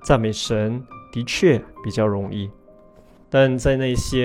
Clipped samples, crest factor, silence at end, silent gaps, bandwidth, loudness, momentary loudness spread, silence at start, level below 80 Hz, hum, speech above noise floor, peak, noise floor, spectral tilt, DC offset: under 0.1%; 18 dB; 0 s; none; 15.5 kHz; -21 LUFS; 13 LU; 0 s; -38 dBFS; none; 29 dB; -2 dBFS; -49 dBFS; -5.5 dB/octave; under 0.1%